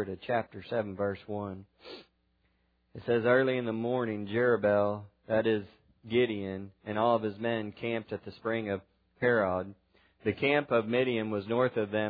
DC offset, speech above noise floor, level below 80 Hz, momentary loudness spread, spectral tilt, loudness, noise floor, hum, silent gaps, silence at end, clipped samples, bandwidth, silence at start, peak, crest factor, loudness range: under 0.1%; 42 dB; -70 dBFS; 14 LU; -9.5 dB/octave; -31 LUFS; -73 dBFS; none; none; 0 s; under 0.1%; 5 kHz; 0 s; -12 dBFS; 20 dB; 4 LU